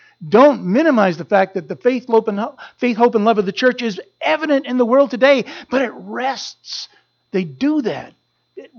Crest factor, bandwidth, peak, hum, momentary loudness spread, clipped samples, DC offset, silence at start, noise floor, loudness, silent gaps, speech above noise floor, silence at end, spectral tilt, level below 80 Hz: 16 dB; 7 kHz; 0 dBFS; none; 13 LU; under 0.1%; under 0.1%; 0.2 s; -40 dBFS; -17 LUFS; none; 24 dB; 0.15 s; -6 dB/octave; -66 dBFS